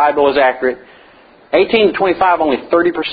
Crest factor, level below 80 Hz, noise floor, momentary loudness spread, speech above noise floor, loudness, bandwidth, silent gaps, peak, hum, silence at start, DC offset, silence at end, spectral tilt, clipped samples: 14 dB; -50 dBFS; -44 dBFS; 7 LU; 31 dB; -13 LUFS; 5 kHz; none; 0 dBFS; none; 0 s; under 0.1%; 0 s; -8.5 dB/octave; under 0.1%